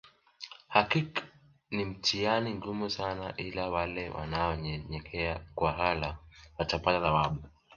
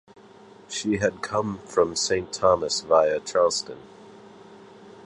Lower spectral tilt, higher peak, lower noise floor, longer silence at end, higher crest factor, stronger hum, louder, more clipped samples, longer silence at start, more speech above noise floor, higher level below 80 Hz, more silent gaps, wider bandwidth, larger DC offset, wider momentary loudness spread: first, -5 dB/octave vs -3.5 dB/octave; second, -8 dBFS vs -4 dBFS; first, -56 dBFS vs -49 dBFS; first, 0.3 s vs 0.05 s; about the same, 24 dB vs 20 dB; neither; second, -32 LUFS vs -24 LUFS; neither; second, 0.05 s vs 0.7 s; about the same, 25 dB vs 26 dB; first, -50 dBFS vs -56 dBFS; neither; second, 7.2 kHz vs 11.5 kHz; neither; about the same, 11 LU vs 9 LU